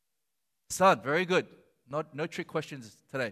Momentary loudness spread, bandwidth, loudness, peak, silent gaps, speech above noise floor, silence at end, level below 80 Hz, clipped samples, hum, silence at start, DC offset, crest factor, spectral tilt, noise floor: 18 LU; 15.5 kHz; -30 LUFS; -12 dBFS; none; 55 dB; 0 s; -70 dBFS; under 0.1%; none; 0.7 s; under 0.1%; 20 dB; -4.5 dB/octave; -85 dBFS